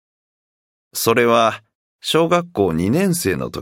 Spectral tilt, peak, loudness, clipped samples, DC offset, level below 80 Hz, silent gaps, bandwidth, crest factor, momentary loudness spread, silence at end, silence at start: -4.5 dB/octave; -2 dBFS; -17 LUFS; under 0.1%; under 0.1%; -50 dBFS; 1.75-1.99 s; 16.5 kHz; 18 dB; 11 LU; 0 s; 0.95 s